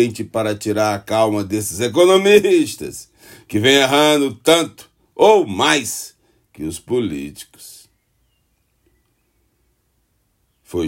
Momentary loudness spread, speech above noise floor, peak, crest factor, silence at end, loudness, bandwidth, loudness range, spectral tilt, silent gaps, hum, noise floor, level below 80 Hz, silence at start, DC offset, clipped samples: 18 LU; 49 dB; 0 dBFS; 18 dB; 0 s; -16 LUFS; 16.5 kHz; 14 LU; -4 dB/octave; none; none; -65 dBFS; -56 dBFS; 0 s; under 0.1%; under 0.1%